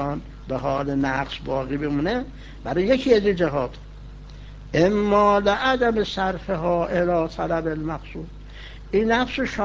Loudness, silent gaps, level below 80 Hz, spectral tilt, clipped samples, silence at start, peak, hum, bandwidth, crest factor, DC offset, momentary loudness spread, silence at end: -22 LUFS; none; -40 dBFS; -6.5 dB/octave; under 0.1%; 0 s; -4 dBFS; 50 Hz at -40 dBFS; 7.8 kHz; 18 dB; under 0.1%; 22 LU; 0 s